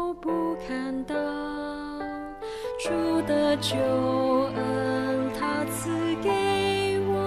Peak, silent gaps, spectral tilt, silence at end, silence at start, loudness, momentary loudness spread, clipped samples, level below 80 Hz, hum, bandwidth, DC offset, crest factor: -12 dBFS; none; -5 dB/octave; 0 s; 0 s; -27 LUFS; 10 LU; under 0.1%; -52 dBFS; none; 14 kHz; under 0.1%; 14 dB